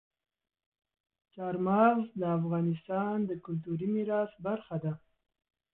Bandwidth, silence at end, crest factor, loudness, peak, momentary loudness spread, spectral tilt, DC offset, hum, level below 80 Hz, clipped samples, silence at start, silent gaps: 4 kHz; 0.8 s; 18 dB; -32 LUFS; -14 dBFS; 12 LU; -12 dB/octave; under 0.1%; none; -70 dBFS; under 0.1%; 1.35 s; none